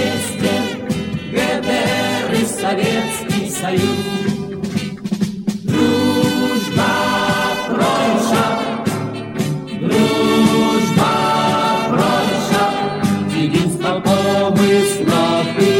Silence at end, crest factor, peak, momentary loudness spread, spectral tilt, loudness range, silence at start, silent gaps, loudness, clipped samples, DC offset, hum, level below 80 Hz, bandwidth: 0 s; 16 dB; 0 dBFS; 8 LU; -5 dB/octave; 3 LU; 0 s; none; -17 LUFS; under 0.1%; under 0.1%; none; -48 dBFS; 17.5 kHz